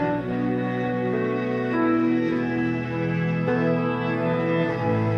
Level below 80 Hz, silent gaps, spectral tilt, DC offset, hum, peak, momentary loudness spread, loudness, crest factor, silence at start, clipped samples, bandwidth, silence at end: -56 dBFS; none; -9 dB/octave; under 0.1%; none; -10 dBFS; 4 LU; -24 LUFS; 12 dB; 0 s; under 0.1%; 6.6 kHz; 0 s